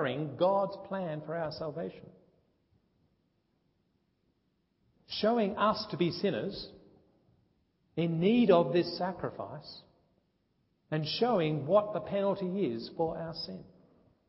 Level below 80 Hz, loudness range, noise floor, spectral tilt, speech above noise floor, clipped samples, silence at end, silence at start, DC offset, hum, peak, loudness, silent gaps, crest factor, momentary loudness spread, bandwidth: -68 dBFS; 10 LU; -76 dBFS; -10 dB/octave; 45 dB; under 0.1%; 0.65 s; 0 s; under 0.1%; none; -12 dBFS; -31 LUFS; none; 22 dB; 16 LU; 5.8 kHz